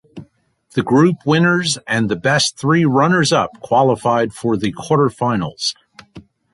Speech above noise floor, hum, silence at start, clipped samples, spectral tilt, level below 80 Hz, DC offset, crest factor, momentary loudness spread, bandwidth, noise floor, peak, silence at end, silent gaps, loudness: 38 dB; none; 0.15 s; under 0.1%; -5 dB/octave; -52 dBFS; under 0.1%; 14 dB; 7 LU; 11.5 kHz; -54 dBFS; -2 dBFS; 0.35 s; none; -16 LUFS